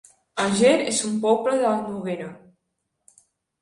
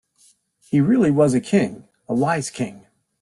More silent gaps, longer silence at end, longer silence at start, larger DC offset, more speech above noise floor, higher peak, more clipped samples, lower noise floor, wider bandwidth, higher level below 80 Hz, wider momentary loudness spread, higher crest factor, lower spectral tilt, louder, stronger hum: neither; first, 1.25 s vs 0.45 s; second, 0.35 s vs 0.7 s; neither; first, 56 dB vs 40 dB; about the same, -4 dBFS vs -6 dBFS; neither; first, -77 dBFS vs -58 dBFS; about the same, 11.5 kHz vs 12 kHz; second, -64 dBFS vs -58 dBFS; first, 14 LU vs 11 LU; about the same, 20 dB vs 16 dB; second, -4 dB/octave vs -6.5 dB/octave; about the same, -22 LUFS vs -20 LUFS; neither